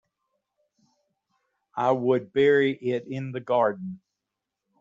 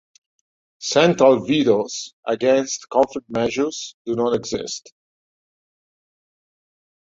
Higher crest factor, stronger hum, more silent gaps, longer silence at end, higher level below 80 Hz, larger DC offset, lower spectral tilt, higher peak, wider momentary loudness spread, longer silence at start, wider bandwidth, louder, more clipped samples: about the same, 18 dB vs 20 dB; neither; second, none vs 2.13-2.23 s, 3.94-4.05 s; second, 0.85 s vs 2.2 s; second, -70 dBFS vs -60 dBFS; neither; about the same, -5 dB/octave vs -4.5 dB/octave; second, -8 dBFS vs -2 dBFS; first, 17 LU vs 13 LU; first, 1.75 s vs 0.8 s; about the same, 7.4 kHz vs 7.8 kHz; second, -24 LUFS vs -20 LUFS; neither